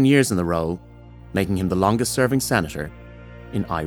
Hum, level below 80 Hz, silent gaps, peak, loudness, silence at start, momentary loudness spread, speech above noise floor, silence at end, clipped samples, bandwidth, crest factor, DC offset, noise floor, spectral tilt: none; -44 dBFS; none; -2 dBFS; -22 LUFS; 0 s; 16 LU; 20 dB; 0 s; under 0.1%; 19.5 kHz; 20 dB; under 0.1%; -40 dBFS; -5.5 dB/octave